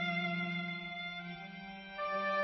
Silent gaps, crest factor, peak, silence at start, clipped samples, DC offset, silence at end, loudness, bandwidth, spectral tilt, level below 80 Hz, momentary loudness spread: none; 14 dB; -24 dBFS; 0 s; under 0.1%; under 0.1%; 0 s; -39 LUFS; 6.2 kHz; -3 dB/octave; -72 dBFS; 12 LU